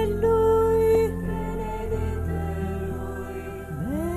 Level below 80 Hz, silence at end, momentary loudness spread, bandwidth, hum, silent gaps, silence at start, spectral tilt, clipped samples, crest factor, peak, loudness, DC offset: -34 dBFS; 0 s; 13 LU; 14 kHz; none; none; 0 s; -8 dB/octave; under 0.1%; 14 dB; -10 dBFS; -25 LUFS; under 0.1%